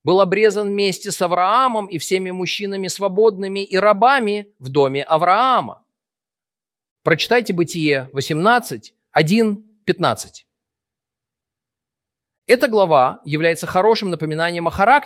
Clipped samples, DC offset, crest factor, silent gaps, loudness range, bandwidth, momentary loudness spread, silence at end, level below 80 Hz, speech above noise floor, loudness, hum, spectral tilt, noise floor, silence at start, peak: under 0.1%; under 0.1%; 18 dB; 6.91-6.96 s, 12.38-12.42 s; 5 LU; 16 kHz; 9 LU; 0 s; -56 dBFS; over 73 dB; -18 LUFS; none; -5 dB/octave; under -90 dBFS; 0.05 s; -2 dBFS